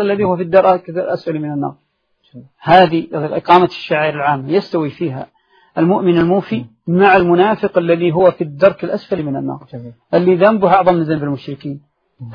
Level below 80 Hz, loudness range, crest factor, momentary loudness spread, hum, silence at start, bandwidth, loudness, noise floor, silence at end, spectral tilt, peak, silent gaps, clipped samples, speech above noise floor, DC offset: -52 dBFS; 2 LU; 14 dB; 15 LU; none; 0 s; 6.4 kHz; -14 LUFS; -61 dBFS; 0 s; -9 dB/octave; 0 dBFS; none; under 0.1%; 47 dB; under 0.1%